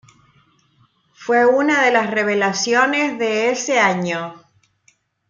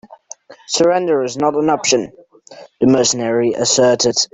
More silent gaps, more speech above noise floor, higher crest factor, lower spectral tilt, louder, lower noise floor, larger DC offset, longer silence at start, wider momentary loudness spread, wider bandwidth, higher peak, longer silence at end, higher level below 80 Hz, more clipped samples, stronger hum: neither; first, 43 dB vs 26 dB; about the same, 16 dB vs 16 dB; about the same, -3.5 dB/octave vs -3 dB/octave; about the same, -17 LUFS vs -15 LUFS; first, -60 dBFS vs -41 dBFS; neither; first, 1.2 s vs 0.1 s; first, 9 LU vs 5 LU; second, 7.6 kHz vs 8.4 kHz; about the same, -2 dBFS vs 0 dBFS; first, 0.9 s vs 0.1 s; second, -70 dBFS vs -56 dBFS; neither; neither